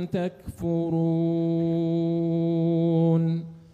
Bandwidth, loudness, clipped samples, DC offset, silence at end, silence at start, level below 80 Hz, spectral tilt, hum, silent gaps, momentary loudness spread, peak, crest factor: 4.4 kHz; -25 LUFS; under 0.1%; under 0.1%; 0.15 s; 0 s; -56 dBFS; -10 dB/octave; none; none; 8 LU; -12 dBFS; 12 dB